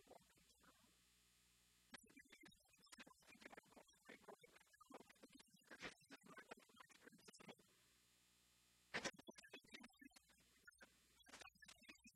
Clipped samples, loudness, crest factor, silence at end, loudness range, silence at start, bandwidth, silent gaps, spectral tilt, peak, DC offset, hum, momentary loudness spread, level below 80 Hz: under 0.1%; -61 LUFS; 30 dB; 0 s; 9 LU; 0 s; 15 kHz; none; -2 dB/octave; -34 dBFS; under 0.1%; none; 15 LU; -88 dBFS